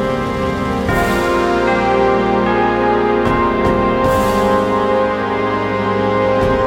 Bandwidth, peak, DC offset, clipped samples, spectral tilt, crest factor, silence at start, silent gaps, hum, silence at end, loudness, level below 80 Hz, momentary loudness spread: 17 kHz; -2 dBFS; under 0.1%; under 0.1%; -6.5 dB/octave; 14 dB; 0 s; none; none; 0 s; -15 LUFS; -32 dBFS; 3 LU